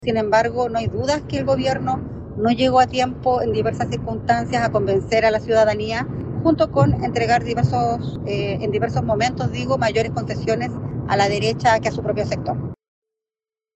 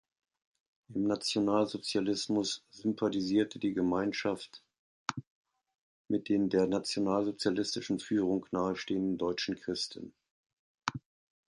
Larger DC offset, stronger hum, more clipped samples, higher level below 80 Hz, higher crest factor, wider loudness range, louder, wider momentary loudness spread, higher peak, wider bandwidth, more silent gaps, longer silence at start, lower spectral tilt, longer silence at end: neither; neither; neither; first, -42 dBFS vs -68 dBFS; second, 16 dB vs 22 dB; about the same, 3 LU vs 3 LU; first, -20 LUFS vs -33 LUFS; about the same, 8 LU vs 10 LU; first, -4 dBFS vs -10 dBFS; second, 8.4 kHz vs 11.5 kHz; second, none vs 4.79-5.06 s, 5.27-5.45 s, 5.81-6.05 s, 10.30-10.44 s, 10.53-10.75 s; second, 0 s vs 0.9 s; about the same, -6 dB/octave vs -5 dB/octave; first, 1 s vs 0.55 s